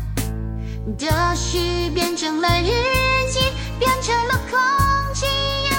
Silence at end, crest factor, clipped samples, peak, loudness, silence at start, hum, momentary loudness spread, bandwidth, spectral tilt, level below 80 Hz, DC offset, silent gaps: 0 s; 16 dB; under 0.1%; -4 dBFS; -20 LUFS; 0 s; none; 9 LU; 17 kHz; -4 dB/octave; -28 dBFS; under 0.1%; none